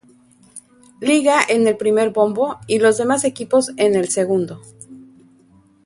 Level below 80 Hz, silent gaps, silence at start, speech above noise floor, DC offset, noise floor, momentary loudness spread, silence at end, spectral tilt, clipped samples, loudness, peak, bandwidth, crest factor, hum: -62 dBFS; none; 0.55 s; 36 dB; under 0.1%; -52 dBFS; 7 LU; 0.85 s; -4 dB/octave; under 0.1%; -17 LUFS; 0 dBFS; 11.5 kHz; 18 dB; none